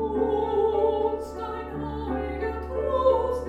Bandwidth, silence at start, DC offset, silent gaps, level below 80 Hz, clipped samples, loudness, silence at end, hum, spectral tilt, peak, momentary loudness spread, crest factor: 9.8 kHz; 0 s; under 0.1%; none; -40 dBFS; under 0.1%; -26 LUFS; 0 s; none; -7.5 dB/octave; -10 dBFS; 10 LU; 16 dB